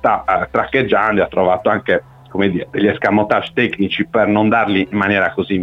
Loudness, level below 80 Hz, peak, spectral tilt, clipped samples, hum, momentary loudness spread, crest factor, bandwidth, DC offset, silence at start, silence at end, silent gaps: -16 LUFS; -46 dBFS; -2 dBFS; -8 dB/octave; under 0.1%; none; 4 LU; 14 dB; 7 kHz; under 0.1%; 0.05 s; 0 s; none